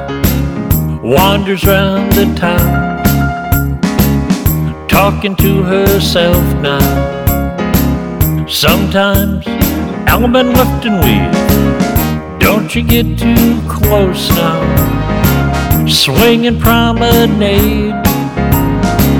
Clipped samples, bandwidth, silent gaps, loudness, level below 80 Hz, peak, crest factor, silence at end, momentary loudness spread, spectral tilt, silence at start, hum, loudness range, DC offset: under 0.1%; over 20 kHz; none; -11 LUFS; -20 dBFS; 0 dBFS; 10 dB; 0 s; 5 LU; -5.5 dB/octave; 0 s; none; 2 LU; under 0.1%